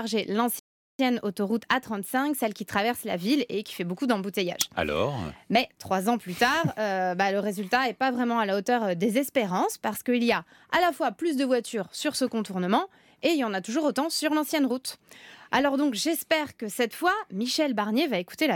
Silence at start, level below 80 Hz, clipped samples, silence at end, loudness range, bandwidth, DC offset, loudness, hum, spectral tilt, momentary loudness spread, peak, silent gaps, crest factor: 0 s; -64 dBFS; under 0.1%; 0 s; 2 LU; 18 kHz; under 0.1%; -27 LUFS; none; -4 dB/octave; 5 LU; -8 dBFS; 0.59-0.99 s; 18 dB